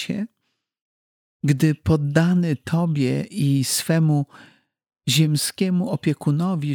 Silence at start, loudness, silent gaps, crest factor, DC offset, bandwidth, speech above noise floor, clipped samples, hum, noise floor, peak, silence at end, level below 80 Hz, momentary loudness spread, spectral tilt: 0 s; -21 LUFS; 0.81-1.40 s; 18 dB; under 0.1%; 19 kHz; 55 dB; under 0.1%; none; -75 dBFS; -4 dBFS; 0 s; -52 dBFS; 8 LU; -5.5 dB/octave